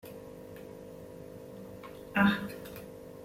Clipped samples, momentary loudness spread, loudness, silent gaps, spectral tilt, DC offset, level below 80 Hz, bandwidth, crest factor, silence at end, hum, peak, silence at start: under 0.1%; 20 LU; -31 LUFS; none; -6 dB/octave; under 0.1%; -62 dBFS; 16.5 kHz; 24 dB; 0 s; none; -12 dBFS; 0.05 s